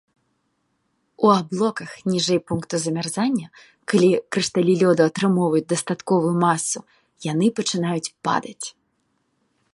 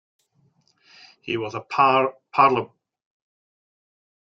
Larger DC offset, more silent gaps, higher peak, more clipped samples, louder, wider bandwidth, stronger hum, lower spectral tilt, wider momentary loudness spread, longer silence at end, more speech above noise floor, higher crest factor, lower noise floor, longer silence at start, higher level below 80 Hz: neither; neither; about the same, -2 dBFS vs -4 dBFS; neither; about the same, -21 LUFS vs -21 LUFS; first, 11.5 kHz vs 7.6 kHz; neither; about the same, -5 dB/octave vs -6 dB/octave; second, 9 LU vs 14 LU; second, 1.05 s vs 1.55 s; first, 50 dB vs 44 dB; about the same, 20 dB vs 22 dB; first, -71 dBFS vs -64 dBFS; about the same, 1.2 s vs 1.25 s; first, -64 dBFS vs -70 dBFS